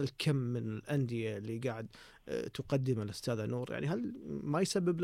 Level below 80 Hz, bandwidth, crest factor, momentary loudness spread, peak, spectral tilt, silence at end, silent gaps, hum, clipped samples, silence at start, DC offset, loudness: -66 dBFS; 15.5 kHz; 16 dB; 8 LU; -20 dBFS; -6 dB/octave; 0 s; none; none; under 0.1%; 0 s; under 0.1%; -36 LUFS